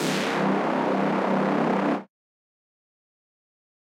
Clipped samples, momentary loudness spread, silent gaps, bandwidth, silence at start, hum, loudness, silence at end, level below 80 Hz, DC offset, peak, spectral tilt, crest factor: under 0.1%; 2 LU; none; 16 kHz; 0 s; none; -24 LUFS; 1.8 s; -80 dBFS; under 0.1%; -12 dBFS; -5.5 dB/octave; 16 dB